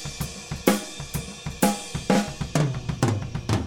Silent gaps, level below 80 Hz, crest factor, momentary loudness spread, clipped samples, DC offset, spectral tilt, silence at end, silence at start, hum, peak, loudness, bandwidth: none; -42 dBFS; 24 dB; 9 LU; under 0.1%; under 0.1%; -5 dB/octave; 0 s; 0 s; none; -2 dBFS; -26 LUFS; 17.5 kHz